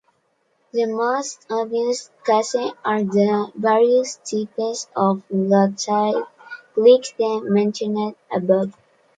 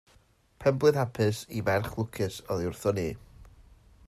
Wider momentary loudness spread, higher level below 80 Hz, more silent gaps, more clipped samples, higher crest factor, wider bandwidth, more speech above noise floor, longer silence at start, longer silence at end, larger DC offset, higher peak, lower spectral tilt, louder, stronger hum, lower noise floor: about the same, 10 LU vs 9 LU; second, -70 dBFS vs -56 dBFS; neither; neither; about the same, 18 dB vs 20 dB; second, 9.2 kHz vs 14.5 kHz; first, 47 dB vs 35 dB; first, 0.75 s vs 0.6 s; second, 0.45 s vs 0.6 s; neither; first, -2 dBFS vs -10 dBFS; about the same, -5.5 dB/octave vs -6 dB/octave; first, -20 LUFS vs -29 LUFS; neither; about the same, -66 dBFS vs -63 dBFS